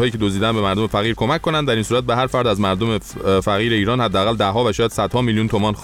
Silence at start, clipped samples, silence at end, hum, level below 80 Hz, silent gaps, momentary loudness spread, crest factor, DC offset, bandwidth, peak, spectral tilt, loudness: 0 s; under 0.1%; 0 s; none; -40 dBFS; none; 2 LU; 12 dB; 0.1%; 16 kHz; -4 dBFS; -5.5 dB/octave; -18 LUFS